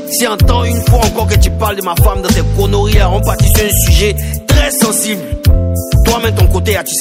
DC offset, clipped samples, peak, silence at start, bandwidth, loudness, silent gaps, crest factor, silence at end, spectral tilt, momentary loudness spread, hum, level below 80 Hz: under 0.1%; 0.9%; 0 dBFS; 0 s; 16.5 kHz; -11 LUFS; none; 10 dB; 0 s; -4.5 dB/octave; 4 LU; none; -14 dBFS